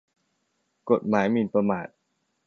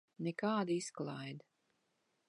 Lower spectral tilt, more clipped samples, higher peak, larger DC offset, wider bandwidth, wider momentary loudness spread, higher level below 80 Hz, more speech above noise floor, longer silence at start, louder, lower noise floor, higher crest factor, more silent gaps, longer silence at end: first, -8 dB/octave vs -5.5 dB/octave; neither; first, -6 dBFS vs -22 dBFS; neither; second, 6.8 kHz vs 11.5 kHz; first, 16 LU vs 13 LU; first, -66 dBFS vs -88 dBFS; first, 52 dB vs 42 dB; first, 0.85 s vs 0.2 s; first, -25 LUFS vs -40 LUFS; second, -75 dBFS vs -81 dBFS; about the same, 20 dB vs 18 dB; neither; second, 0.6 s vs 0.9 s